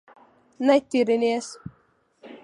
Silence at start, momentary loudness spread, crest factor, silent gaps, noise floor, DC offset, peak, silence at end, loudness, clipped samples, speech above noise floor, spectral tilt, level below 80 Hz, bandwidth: 0.6 s; 21 LU; 18 dB; none; -64 dBFS; under 0.1%; -6 dBFS; 0.1 s; -22 LUFS; under 0.1%; 42 dB; -4.5 dB/octave; -66 dBFS; 11 kHz